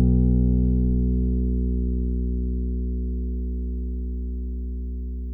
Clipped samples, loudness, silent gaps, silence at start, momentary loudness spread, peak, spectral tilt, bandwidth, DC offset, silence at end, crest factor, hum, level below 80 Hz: under 0.1%; -26 LUFS; none; 0 s; 11 LU; -8 dBFS; -15.5 dB/octave; 0.9 kHz; under 0.1%; 0 s; 14 dB; 60 Hz at -75 dBFS; -24 dBFS